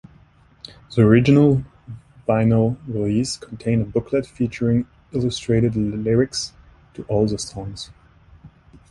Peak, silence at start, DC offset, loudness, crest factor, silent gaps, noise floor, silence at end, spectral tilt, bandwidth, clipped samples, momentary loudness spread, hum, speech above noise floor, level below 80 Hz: -2 dBFS; 0.9 s; under 0.1%; -20 LUFS; 18 dB; none; -52 dBFS; 0.45 s; -6.5 dB/octave; 11.5 kHz; under 0.1%; 20 LU; none; 33 dB; -44 dBFS